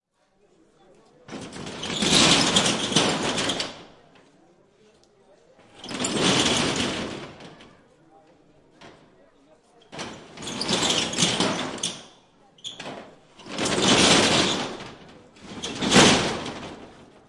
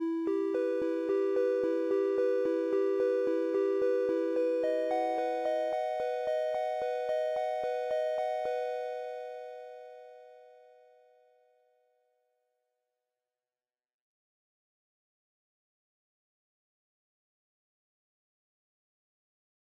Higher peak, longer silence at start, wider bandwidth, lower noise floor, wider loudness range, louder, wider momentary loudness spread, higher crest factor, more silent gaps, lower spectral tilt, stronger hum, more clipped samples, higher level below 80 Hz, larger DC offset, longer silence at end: first, -4 dBFS vs -18 dBFS; first, 1.3 s vs 0 s; first, 11.5 kHz vs 9.8 kHz; second, -64 dBFS vs under -90 dBFS; about the same, 10 LU vs 12 LU; first, -21 LUFS vs -31 LUFS; first, 23 LU vs 10 LU; first, 22 dB vs 16 dB; neither; second, -2.5 dB/octave vs -5 dB/octave; neither; neither; first, -54 dBFS vs -78 dBFS; neither; second, 0.25 s vs 9.15 s